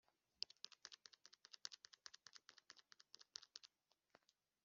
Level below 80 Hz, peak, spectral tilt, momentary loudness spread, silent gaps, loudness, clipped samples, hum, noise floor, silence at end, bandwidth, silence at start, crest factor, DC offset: under -90 dBFS; -26 dBFS; 3.5 dB/octave; 13 LU; none; -59 LUFS; under 0.1%; none; -79 dBFS; 0.45 s; 7.4 kHz; 0.4 s; 38 dB; under 0.1%